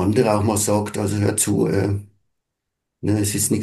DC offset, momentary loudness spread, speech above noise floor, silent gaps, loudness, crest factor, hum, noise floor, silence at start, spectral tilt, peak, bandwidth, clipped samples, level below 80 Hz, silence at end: under 0.1%; 6 LU; 61 dB; none; -20 LUFS; 18 dB; none; -80 dBFS; 0 s; -5 dB/octave; -4 dBFS; 12.5 kHz; under 0.1%; -54 dBFS; 0 s